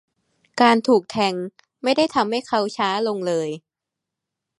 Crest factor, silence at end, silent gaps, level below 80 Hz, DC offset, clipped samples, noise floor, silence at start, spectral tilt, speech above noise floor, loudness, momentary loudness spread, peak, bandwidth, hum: 20 dB; 1 s; none; -66 dBFS; under 0.1%; under 0.1%; -85 dBFS; 0.55 s; -4.5 dB/octave; 65 dB; -21 LUFS; 14 LU; -2 dBFS; 11.5 kHz; none